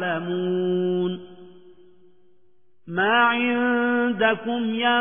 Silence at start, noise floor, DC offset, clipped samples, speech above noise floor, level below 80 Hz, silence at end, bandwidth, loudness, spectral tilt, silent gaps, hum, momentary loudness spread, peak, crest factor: 0 s; -67 dBFS; 0.3%; under 0.1%; 45 dB; -70 dBFS; 0 s; 3.6 kHz; -22 LUFS; -9 dB/octave; none; none; 8 LU; -6 dBFS; 18 dB